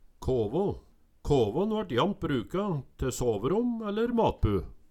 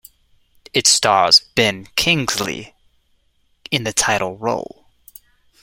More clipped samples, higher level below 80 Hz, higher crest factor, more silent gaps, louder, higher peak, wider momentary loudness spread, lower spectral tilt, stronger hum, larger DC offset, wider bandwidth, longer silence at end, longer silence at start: neither; first, -42 dBFS vs -50 dBFS; about the same, 16 dB vs 20 dB; neither; second, -29 LUFS vs -16 LUFS; second, -12 dBFS vs 0 dBFS; second, 7 LU vs 13 LU; first, -6.5 dB/octave vs -2 dB/octave; neither; neither; about the same, 17 kHz vs 16.5 kHz; second, 0.1 s vs 1 s; second, 0.2 s vs 0.75 s